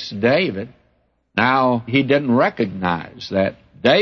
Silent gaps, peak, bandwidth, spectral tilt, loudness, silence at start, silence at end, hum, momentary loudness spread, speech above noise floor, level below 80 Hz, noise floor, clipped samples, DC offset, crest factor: none; -2 dBFS; 7 kHz; -7 dB/octave; -19 LUFS; 0 s; 0 s; none; 10 LU; 45 dB; -56 dBFS; -63 dBFS; under 0.1%; under 0.1%; 16 dB